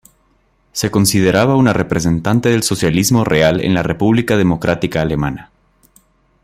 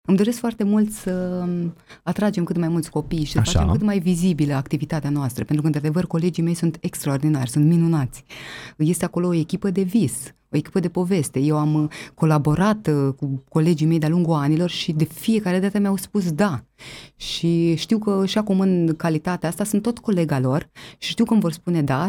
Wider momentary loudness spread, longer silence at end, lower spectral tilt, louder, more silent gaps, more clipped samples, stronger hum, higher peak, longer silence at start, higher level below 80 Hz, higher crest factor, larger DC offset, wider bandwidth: about the same, 6 LU vs 8 LU; first, 1 s vs 0 s; about the same, -5.5 dB/octave vs -6.5 dB/octave; first, -14 LUFS vs -21 LUFS; neither; neither; neither; about the same, 0 dBFS vs -2 dBFS; first, 0.75 s vs 0.1 s; about the same, -40 dBFS vs -42 dBFS; about the same, 14 dB vs 18 dB; neither; about the same, 16 kHz vs 17.5 kHz